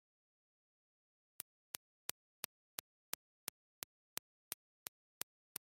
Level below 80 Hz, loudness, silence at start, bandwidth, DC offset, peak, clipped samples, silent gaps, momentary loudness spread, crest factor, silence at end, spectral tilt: under -90 dBFS; -51 LUFS; 4.5 s; 16 kHz; under 0.1%; -12 dBFS; under 0.1%; none; 5 LU; 42 dB; 1.05 s; 0.5 dB/octave